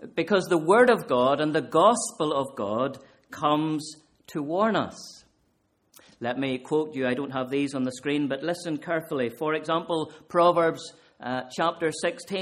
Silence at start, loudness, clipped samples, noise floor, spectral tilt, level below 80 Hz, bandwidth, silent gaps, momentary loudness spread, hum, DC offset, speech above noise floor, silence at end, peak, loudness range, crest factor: 0 s; -26 LUFS; under 0.1%; -70 dBFS; -5 dB/octave; -68 dBFS; 15 kHz; none; 14 LU; none; under 0.1%; 45 dB; 0 s; -6 dBFS; 7 LU; 20 dB